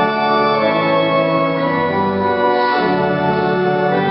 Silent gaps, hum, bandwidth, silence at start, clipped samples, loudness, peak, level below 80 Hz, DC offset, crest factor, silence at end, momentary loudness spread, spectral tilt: none; none; 5.8 kHz; 0 s; under 0.1%; -15 LUFS; -2 dBFS; -52 dBFS; under 0.1%; 12 dB; 0 s; 2 LU; -11.5 dB/octave